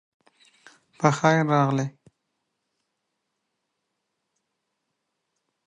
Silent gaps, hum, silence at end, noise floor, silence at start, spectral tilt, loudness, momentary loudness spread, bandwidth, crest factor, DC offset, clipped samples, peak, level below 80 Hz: none; none; 3.75 s; -79 dBFS; 1 s; -6.5 dB/octave; -22 LUFS; 8 LU; 9.8 kHz; 26 dB; under 0.1%; under 0.1%; -4 dBFS; -72 dBFS